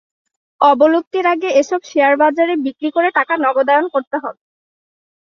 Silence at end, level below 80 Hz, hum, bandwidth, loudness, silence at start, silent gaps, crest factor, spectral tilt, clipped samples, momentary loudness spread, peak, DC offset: 0.9 s; -68 dBFS; none; 7.2 kHz; -15 LUFS; 0.6 s; 1.07-1.11 s, 4.07-4.11 s; 16 dB; -3 dB/octave; under 0.1%; 7 LU; 0 dBFS; under 0.1%